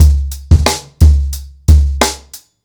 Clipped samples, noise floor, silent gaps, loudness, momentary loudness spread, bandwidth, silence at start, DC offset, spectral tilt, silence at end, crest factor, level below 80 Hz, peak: under 0.1%; -36 dBFS; none; -13 LUFS; 8 LU; 18.5 kHz; 0 s; under 0.1%; -5 dB/octave; 0.3 s; 10 dB; -12 dBFS; 0 dBFS